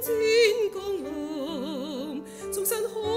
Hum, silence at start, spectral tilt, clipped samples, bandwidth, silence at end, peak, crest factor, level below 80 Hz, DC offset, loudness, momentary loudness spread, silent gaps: none; 0 s; -3 dB/octave; under 0.1%; 16 kHz; 0 s; -10 dBFS; 16 dB; -60 dBFS; under 0.1%; -27 LUFS; 13 LU; none